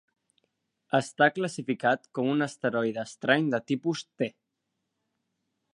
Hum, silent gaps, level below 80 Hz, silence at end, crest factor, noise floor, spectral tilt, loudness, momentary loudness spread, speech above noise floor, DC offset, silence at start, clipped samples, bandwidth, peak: none; none; -78 dBFS; 1.45 s; 22 dB; -82 dBFS; -5.5 dB/octave; -28 LUFS; 8 LU; 54 dB; under 0.1%; 0.95 s; under 0.1%; 11 kHz; -6 dBFS